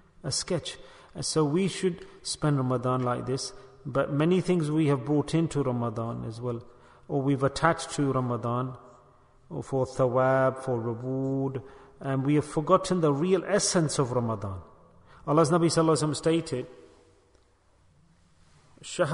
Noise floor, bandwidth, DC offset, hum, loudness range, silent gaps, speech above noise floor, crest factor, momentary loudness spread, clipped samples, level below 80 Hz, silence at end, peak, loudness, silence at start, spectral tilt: -63 dBFS; 11 kHz; under 0.1%; none; 3 LU; none; 36 dB; 22 dB; 14 LU; under 0.1%; -56 dBFS; 0 s; -6 dBFS; -27 LUFS; 0.25 s; -5.5 dB/octave